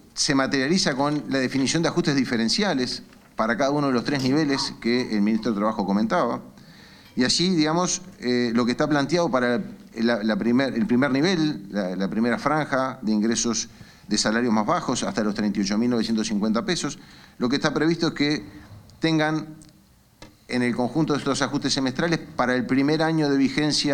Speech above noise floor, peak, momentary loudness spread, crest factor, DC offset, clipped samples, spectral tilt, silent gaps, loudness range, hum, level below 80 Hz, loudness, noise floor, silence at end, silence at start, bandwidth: 33 dB; -4 dBFS; 6 LU; 20 dB; under 0.1%; under 0.1%; -4.5 dB/octave; none; 3 LU; none; -54 dBFS; -23 LUFS; -56 dBFS; 0 s; 0.15 s; 13 kHz